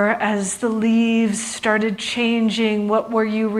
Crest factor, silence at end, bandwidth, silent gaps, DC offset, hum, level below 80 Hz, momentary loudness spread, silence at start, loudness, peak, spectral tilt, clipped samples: 16 dB; 0 s; 12.5 kHz; none; under 0.1%; none; -60 dBFS; 4 LU; 0 s; -19 LUFS; -2 dBFS; -4 dB/octave; under 0.1%